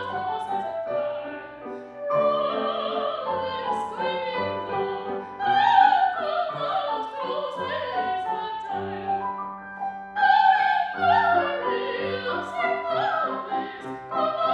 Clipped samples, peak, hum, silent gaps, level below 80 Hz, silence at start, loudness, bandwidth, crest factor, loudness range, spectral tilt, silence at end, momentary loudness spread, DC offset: under 0.1%; -4 dBFS; none; none; -66 dBFS; 0 s; -25 LUFS; 8.6 kHz; 20 dB; 5 LU; -5.5 dB/octave; 0 s; 14 LU; under 0.1%